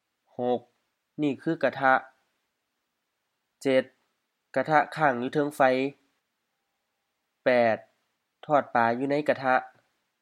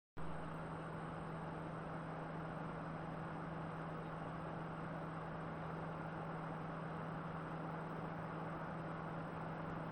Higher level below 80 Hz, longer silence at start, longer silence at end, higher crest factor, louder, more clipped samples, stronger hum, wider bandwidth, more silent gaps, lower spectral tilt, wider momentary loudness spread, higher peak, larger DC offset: second, -84 dBFS vs -64 dBFS; first, 0.4 s vs 0.15 s; first, 0.55 s vs 0 s; first, 22 dB vs 12 dB; first, -26 LUFS vs -47 LUFS; neither; neither; first, 15 kHz vs 8.6 kHz; neither; second, -6 dB/octave vs -8 dB/octave; first, 10 LU vs 1 LU; first, -6 dBFS vs -34 dBFS; neither